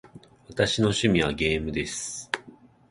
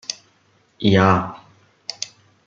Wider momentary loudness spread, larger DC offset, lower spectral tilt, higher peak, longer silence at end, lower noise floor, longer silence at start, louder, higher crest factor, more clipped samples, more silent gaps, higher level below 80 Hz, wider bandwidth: second, 11 LU vs 19 LU; neither; about the same, -4.5 dB/octave vs -5.5 dB/octave; second, -6 dBFS vs -2 dBFS; about the same, 0.4 s vs 0.4 s; second, -52 dBFS vs -60 dBFS; about the same, 0.15 s vs 0.1 s; second, -26 LUFS vs -19 LUFS; about the same, 20 dB vs 20 dB; neither; neither; first, -46 dBFS vs -56 dBFS; first, 11.5 kHz vs 7.6 kHz